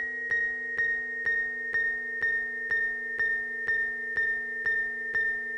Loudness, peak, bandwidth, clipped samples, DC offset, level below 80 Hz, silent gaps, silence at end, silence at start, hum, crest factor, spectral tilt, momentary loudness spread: -28 LUFS; -20 dBFS; 9.6 kHz; under 0.1%; under 0.1%; -60 dBFS; none; 0 s; 0 s; none; 10 dB; -3.5 dB/octave; 1 LU